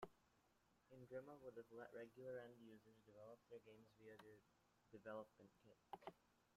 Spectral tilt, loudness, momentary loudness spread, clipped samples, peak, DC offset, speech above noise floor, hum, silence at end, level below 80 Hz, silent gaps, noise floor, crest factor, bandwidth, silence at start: -6.5 dB/octave; -61 LUFS; 11 LU; under 0.1%; -38 dBFS; under 0.1%; 21 dB; none; 0 s; -90 dBFS; none; -82 dBFS; 24 dB; 14 kHz; 0 s